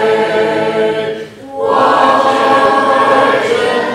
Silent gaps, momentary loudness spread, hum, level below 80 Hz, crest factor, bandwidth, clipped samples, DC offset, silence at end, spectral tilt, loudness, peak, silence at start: none; 10 LU; none; -54 dBFS; 12 dB; 13.5 kHz; under 0.1%; under 0.1%; 0 s; -4.5 dB/octave; -11 LUFS; 0 dBFS; 0 s